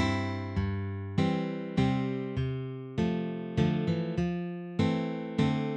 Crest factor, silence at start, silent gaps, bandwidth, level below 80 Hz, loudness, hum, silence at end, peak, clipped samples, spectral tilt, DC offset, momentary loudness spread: 16 dB; 0 s; none; 8.8 kHz; -50 dBFS; -31 LUFS; none; 0 s; -14 dBFS; under 0.1%; -7.5 dB/octave; under 0.1%; 5 LU